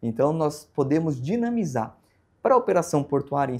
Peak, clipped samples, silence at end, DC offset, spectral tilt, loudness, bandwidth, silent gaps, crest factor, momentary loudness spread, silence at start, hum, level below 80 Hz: -6 dBFS; under 0.1%; 0 s; under 0.1%; -7 dB/octave; -24 LUFS; 15.5 kHz; none; 18 dB; 8 LU; 0 s; none; -60 dBFS